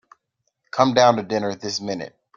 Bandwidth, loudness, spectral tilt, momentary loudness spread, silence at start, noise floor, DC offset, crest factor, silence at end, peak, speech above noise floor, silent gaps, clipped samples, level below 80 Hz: 7.4 kHz; -20 LUFS; -4.5 dB/octave; 14 LU; 0.75 s; -74 dBFS; under 0.1%; 22 dB; 0.3 s; -2 dBFS; 55 dB; none; under 0.1%; -62 dBFS